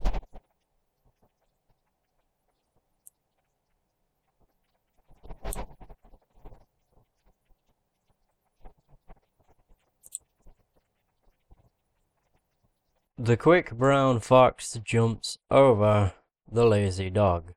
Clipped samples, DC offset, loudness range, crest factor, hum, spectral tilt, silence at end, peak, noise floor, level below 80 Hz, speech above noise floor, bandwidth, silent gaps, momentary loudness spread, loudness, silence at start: under 0.1%; under 0.1%; 25 LU; 24 dB; none; -6.5 dB/octave; 0.05 s; -4 dBFS; -77 dBFS; -46 dBFS; 54 dB; 14.5 kHz; none; 22 LU; -23 LUFS; 0 s